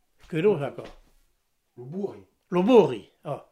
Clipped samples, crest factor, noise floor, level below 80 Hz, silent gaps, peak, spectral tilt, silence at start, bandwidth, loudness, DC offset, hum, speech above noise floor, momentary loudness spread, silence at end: under 0.1%; 22 dB; -71 dBFS; -62 dBFS; none; -6 dBFS; -7.5 dB/octave; 0.3 s; 11 kHz; -24 LUFS; under 0.1%; none; 47 dB; 18 LU; 0.1 s